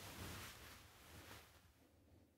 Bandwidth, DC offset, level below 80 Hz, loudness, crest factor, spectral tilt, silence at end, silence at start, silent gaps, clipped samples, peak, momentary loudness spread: 16 kHz; under 0.1%; -70 dBFS; -56 LUFS; 18 dB; -3 dB/octave; 0 s; 0 s; none; under 0.1%; -40 dBFS; 12 LU